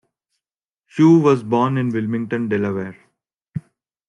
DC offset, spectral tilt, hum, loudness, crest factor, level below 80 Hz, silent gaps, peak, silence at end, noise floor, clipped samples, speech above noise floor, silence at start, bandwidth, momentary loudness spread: under 0.1%; -8.5 dB/octave; none; -18 LUFS; 16 dB; -64 dBFS; none; -2 dBFS; 0.5 s; -87 dBFS; under 0.1%; 70 dB; 0.95 s; 8.6 kHz; 20 LU